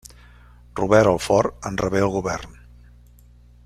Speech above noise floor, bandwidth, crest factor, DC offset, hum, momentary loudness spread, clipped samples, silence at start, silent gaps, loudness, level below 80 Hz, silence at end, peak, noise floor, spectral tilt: 29 dB; 15 kHz; 22 dB; under 0.1%; 60 Hz at -40 dBFS; 15 LU; under 0.1%; 0.75 s; none; -20 LUFS; -44 dBFS; 1.15 s; -2 dBFS; -49 dBFS; -5.5 dB/octave